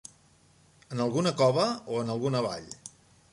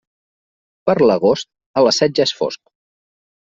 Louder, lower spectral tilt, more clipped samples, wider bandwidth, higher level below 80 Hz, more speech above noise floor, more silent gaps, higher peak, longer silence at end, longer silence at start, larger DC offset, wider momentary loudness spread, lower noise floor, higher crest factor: second, -28 LUFS vs -16 LUFS; about the same, -5.5 dB/octave vs -4.5 dB/octave; neither; first, 11.5 kHz vs 7.8 kHz; second, -68 dBFS vs -58 dBFS; second, 34 dB vs over 75 dB; second, none vs 1.66-1.74 s; second, -10 dBFS vs -2 dBFS; second, 0.45 s vs 0.95 s; about the same, 0.9 s vs 0.85 s; neither; first, 20 LU vs 10 LU; second, -61 dBFS vs under -90 dBFS; about the same, 20 dB vs 16 dB